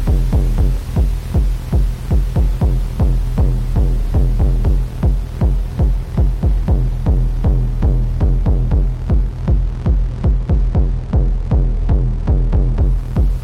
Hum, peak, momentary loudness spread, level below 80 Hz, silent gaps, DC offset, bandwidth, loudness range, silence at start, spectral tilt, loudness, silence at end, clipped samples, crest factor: none; -4 dBFS; 2 LU; -16 dBFS; none; under 0.1%; 5.8 kHz; 1 LU; 0 s; -9 dB/octave; -18 LUFS; 0 s; under 0.1%; 10 dB